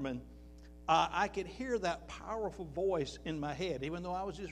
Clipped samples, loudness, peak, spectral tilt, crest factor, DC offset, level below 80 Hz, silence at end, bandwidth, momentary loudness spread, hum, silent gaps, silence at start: under 0.1%; -37 LUFS; -18 dBFS; -5 dB/octave; 20 dB; under 0.1%; -54 dBFS; 0 s; 12 kHz; 14 LU; none; none; 0 s